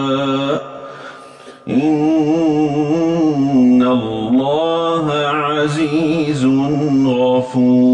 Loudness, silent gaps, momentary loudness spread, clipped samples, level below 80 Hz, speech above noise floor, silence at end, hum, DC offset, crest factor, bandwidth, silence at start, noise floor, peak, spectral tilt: -15 LUFS; none; 7 LU; under 0.1%; -52 dBFS; 24 dB; 0 s; none; under 0.1%; 10 dB; 9.6 kHz; 0 s; -37 dBFS; -4 dBFS; -7 dB/octave